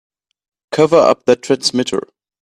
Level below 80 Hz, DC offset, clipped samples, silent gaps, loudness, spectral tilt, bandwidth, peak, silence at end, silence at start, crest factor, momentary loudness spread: -58 dBFS; under 0.1%; under 0.1%; none; -14 LUFS; -4.5 dB/octave; 12.5 kHz; 0 dBFS; 0.45 s; 0.7 s; 16 dB; 11 LU